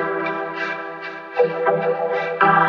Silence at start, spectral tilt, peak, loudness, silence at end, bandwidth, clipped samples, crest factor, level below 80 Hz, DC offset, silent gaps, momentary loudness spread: 0 s; -7 dB/octave; -2 dBFS; -21 LUFS; 0 s; 6.6 kHz; under 0.1%; 18 dB; -84 dBFS; under 0.1%; none; 10 LU